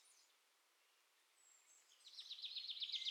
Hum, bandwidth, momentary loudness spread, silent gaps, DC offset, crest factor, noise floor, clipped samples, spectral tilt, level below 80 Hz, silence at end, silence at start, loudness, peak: none; 16 kHz; 24 LU; none; under 0.1%; 22 dB; -78 dBFS; under 0.1%; 5.5 dB/octave; under -90 dBFS; 0 s; 0.05 s; -48 LUFS; -32 dBFS